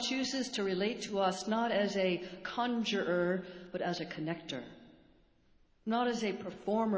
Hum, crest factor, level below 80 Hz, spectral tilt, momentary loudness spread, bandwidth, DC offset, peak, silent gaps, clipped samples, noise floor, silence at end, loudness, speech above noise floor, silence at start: none; 16 dB; -70 dBFS; -4.5 dB/octave; 9 LU; 8 kHz; under 0.1%; -18 dBFS; none; under 0.1%; -67 dBFS; 0 s; -35 LUFS; 33 dB; 0 s